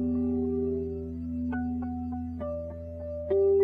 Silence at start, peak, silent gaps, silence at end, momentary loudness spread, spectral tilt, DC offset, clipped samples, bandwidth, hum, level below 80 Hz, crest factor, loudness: 0 s; -16 dBFS; none; 0 s; 9 LU; -11.5 dB/octave; under 0.1%; under 0.1%; 3.2 kHz; none; -46 dBFS; 14 dB; -31 LUFS